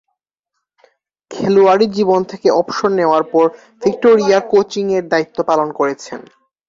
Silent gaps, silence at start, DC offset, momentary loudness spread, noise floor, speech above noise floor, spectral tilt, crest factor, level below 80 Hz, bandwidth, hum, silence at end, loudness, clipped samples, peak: none; 1.3 s; under 0.1%; 9 LU; -76 dBFS; 62 dB; -5.5 dB/octave; 14 dB; -58 dBFS; 7.6 kHz; none; 0.5 s; -14 LUFS; under 0.1%; -2 dBFS